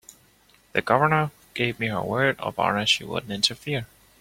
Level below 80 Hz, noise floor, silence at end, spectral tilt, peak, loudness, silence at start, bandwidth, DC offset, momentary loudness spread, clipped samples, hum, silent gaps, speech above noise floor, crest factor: -58 dBFS; -59 dBFS; 0.35 s; -4 dB/octave; -4 dBFS; -24 LUFS; 0.75 s; 16.5 kHz; under 0.1%; 10 LU; under 0.1%; none; none; 35 dB; 22 dB